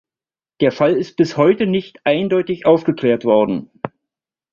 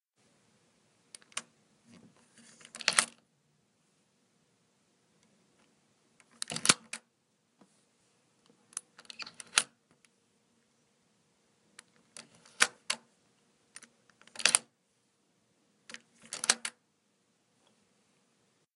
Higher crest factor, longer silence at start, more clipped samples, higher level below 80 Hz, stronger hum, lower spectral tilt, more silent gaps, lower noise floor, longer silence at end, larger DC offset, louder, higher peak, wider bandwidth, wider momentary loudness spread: second, 16 dB vs 40 dB; second, 0.6 s vs 1.35 s; neither; first, -58 dBFS vs -84 dBFS; neither; first, -7.5 dB/octave vs 0.5 dB/octave; neither; first, under -90 dBFS vs -75 dBFS; second, 0.65 s vs 2.05 s; neither; first, -17 LUFS vs -31 LUFS; about the same, -2 dBFS vs 0 dBFS; second, 7.2 kHz vs 15 kHz; second, 8 LU vs 26 LU